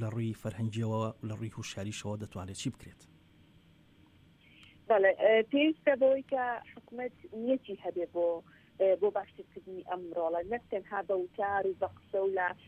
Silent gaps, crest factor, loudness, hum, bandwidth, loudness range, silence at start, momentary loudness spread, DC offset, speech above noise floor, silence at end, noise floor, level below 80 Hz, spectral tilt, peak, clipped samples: none; 20 dB; -32 LUFS; none; 11.5 kHz; 11 LU; 0 s; 15 LU; under 0.1%; 29 dB; 0.1 s; -62 dBFS; -68 dBFS; -6 dB/octave; -14 dBFS; under 0.1%